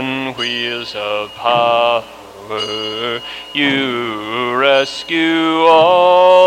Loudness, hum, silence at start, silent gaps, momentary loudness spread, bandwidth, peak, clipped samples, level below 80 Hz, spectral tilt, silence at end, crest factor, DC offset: -15 LUFS; none; 0 s; none; 12 LU; 14 kHz; 0 dBFS; under 0.1%; -56 dBFS; -4 dB/octave; 0 s; 14 dB; under 0.1%